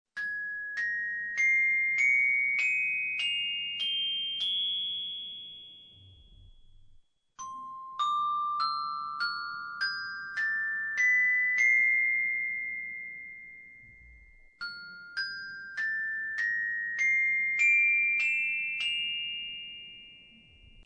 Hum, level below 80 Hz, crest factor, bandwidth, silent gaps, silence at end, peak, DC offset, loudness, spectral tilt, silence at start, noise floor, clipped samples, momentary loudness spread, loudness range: none; -66 dBFS; 14 dB; 10 kHz; none; 0.05 s; -16 dBFS; under 0.1%; -27 LUFS; 1.5 dB/octave; 0.15 s; -59 dBFS; under 0.1%; 19 LU; 11 LU